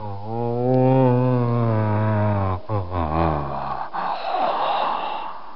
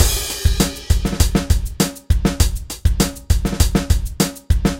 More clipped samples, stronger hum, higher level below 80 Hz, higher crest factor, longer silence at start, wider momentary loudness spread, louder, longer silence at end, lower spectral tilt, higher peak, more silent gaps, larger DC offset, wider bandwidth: neither; neither; second, -42 dBFS vs -20 dBFS; about the same, 16 dB vs 16 dB; about the same, 0 s vs 0 s; first, 10 LU vs 4 LU; second, -22 LUFS vs -19 LUFS; about the same, 0 s vs 0 s; first, -10.5 dB/octave vs -4.5 dB/octave; second, -6 dBFS vs 0 dBFS; neither; first, 2% vs under 0.1%; second, 5.6 kHz vs 17 kHz